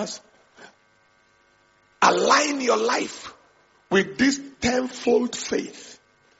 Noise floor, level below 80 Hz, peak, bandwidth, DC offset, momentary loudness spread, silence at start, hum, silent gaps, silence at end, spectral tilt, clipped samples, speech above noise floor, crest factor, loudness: -61 dBFS; -58 dBFS; -2 dBFS; 8 kHz; under 0.1%; 19 LU; 0 s; none; none; 0.45 s; -2 dB/octave; under 0.1%; 38 dB; 22 dB; -22 LUFS